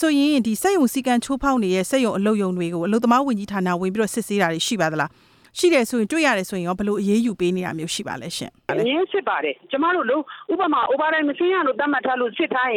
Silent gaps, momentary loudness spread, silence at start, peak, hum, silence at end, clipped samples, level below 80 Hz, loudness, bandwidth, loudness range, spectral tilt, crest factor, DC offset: none; 7 LU; 0 s; -4 dBFS; none; 0 s; under 0.1%; -54 dBFS; -21 LUFS; 17.5 kHz; 3 LU; -4.5 dB/octave; 16 dB; under 0.1%